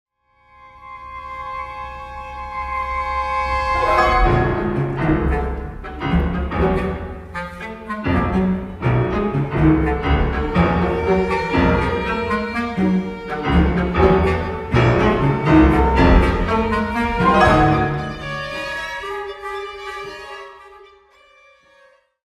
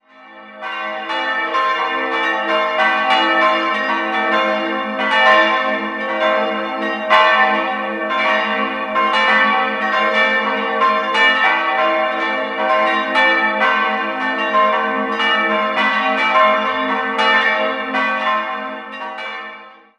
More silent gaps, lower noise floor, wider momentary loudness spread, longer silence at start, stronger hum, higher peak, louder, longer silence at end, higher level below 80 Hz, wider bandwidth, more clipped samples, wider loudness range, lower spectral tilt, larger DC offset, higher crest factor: neither; first, -55 dBFS vs -40 dBFS; first, 16 LU vs 8 LU; first, 0.65 s vs 0.2 s; neither; about the same, 0 dBFS vs 0 dBFS; second, -19 LUFS vs -15 LUFS; first, 1.45 s vs 0.25 s; first, -26 dBFS vs -64 dBFS; about the same, 11.5 kHz vs 10.5 kHz; neither; first, 11 LU vs 2 LU; first, -7.5 dB/octave vs -3.5 dB/octave; neither; about the same, 18 dB vs 16 dB